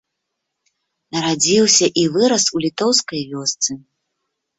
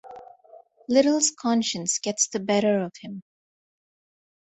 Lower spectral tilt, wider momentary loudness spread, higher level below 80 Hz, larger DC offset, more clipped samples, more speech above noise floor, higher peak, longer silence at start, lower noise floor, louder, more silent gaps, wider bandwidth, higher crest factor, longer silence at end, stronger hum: about the same, -2.5 dB/octave vs -3 dB/octave; second, 10 LU vs 19 LU; first, -60 dBFS vs -70 dBFS; neither; neither; first, 60 dB vs 29 dB; first, 0 dBFS vs -6 dBFS; first, 1.15 s vs 0.05 s; first, -77 dBFS vs -52 dBFS; first, -16 LUFS vs -23 LUFS; neither; about the same, 8.4 kHz vs 8.4 kHz; about the same, 18 dB vs 20 dB; second, 0.8 s vs 1.3 s; neither